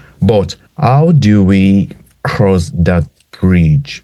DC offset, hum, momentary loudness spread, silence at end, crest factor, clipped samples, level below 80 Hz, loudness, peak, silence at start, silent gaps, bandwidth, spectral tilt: under 0.1%; none; 12 LU; 0.05 s; 10 dB; under 0.1%; -30 dBFS; -11 LUFS; 0 dBFS; 0.2 s; none; 12 kHz; -8 dB/octave